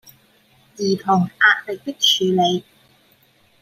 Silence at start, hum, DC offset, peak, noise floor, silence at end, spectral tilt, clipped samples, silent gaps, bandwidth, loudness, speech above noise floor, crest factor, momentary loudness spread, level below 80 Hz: 0.8 s; none; under 0.1%; -2 dBFS; -57 dBFS; 1 s; -3.5 dB/octave; under 0.1%; none; 16 kHz; -18 LUFS; 39 dB; 20 dB; 11 LU; -68 dBFS